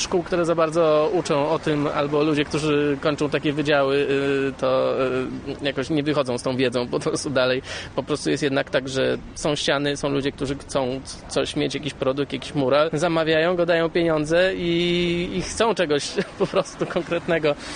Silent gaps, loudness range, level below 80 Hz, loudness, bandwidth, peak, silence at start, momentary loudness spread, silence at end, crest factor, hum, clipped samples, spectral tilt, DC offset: none; 3 LU; -48 dBFS; -22 LUFS; 10 kHz; -6 dBFS; 0 s; 7 LU; 0 s; 16 dB; none; under 0.1%; -5 dB/octave; under 0.1%